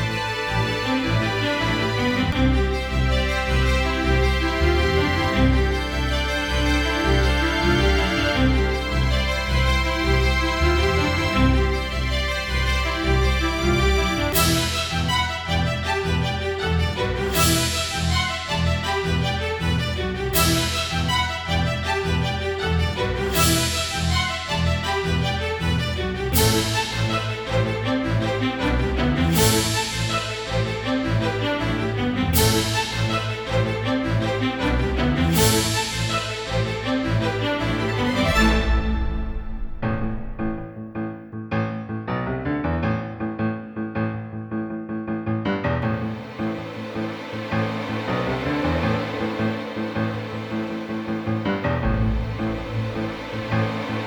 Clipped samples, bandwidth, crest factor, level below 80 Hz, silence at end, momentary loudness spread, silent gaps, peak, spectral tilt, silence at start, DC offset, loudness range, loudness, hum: under 0.1%; over 20 kHz; 18 dB; -28 dBFS; 0 s; 9 LU; none; -4 dBFS; -4.5 dB/octave; 0 s; under 0.1%; 6 LU; -22 LUFS; none